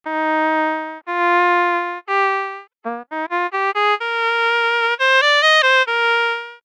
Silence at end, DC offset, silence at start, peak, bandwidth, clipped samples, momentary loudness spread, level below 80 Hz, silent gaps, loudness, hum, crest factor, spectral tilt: 0.1 s; under 0.1%; 0.05 s; -4 dBFS; 12.5 kHz; under 0.1%; 13 LU; under -90 dBFS; none; -16 LUFS; none; 14 dB; -0.5 dB/octave